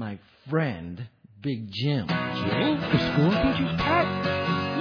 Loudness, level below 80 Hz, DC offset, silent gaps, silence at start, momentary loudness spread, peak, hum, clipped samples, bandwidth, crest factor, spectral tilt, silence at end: -25 LUFS; -46 dBFS; under 0.1%; none; 0 s; 14 LU; -10 dBFS; none; under 0.1%; 5.4 kHz; 16 dB; -7.5 dB/octave; 0 s